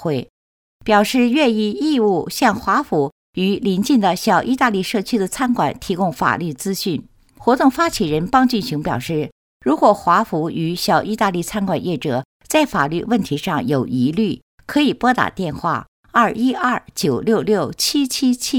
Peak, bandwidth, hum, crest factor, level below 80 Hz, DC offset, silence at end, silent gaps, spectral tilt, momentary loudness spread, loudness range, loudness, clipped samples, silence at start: 0 dBFS; 19 kHz; none; 18 dB; -48 dBFS; under 0.1%; 0 s; 0.30-0.80 s, 3.12-3.33 s, 9.32-9.60 s, 12.25-12.40 s, 14.42-14.58 s, 15.88-16.03 s; -5 dB/octave; 7 LU; 2 LU; -18 LUFS; under 0.1%; 0 s